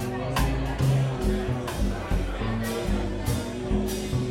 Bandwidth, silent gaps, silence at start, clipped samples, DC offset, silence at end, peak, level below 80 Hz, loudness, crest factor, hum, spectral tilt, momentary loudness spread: 16.5 kHz; none; 0 s; under 0.1%; under 0.1%; 0 s; -12 dBFS; -32 dBFS; -28 LUFS; 14 dB; none; -6 dB/octave; 5 LU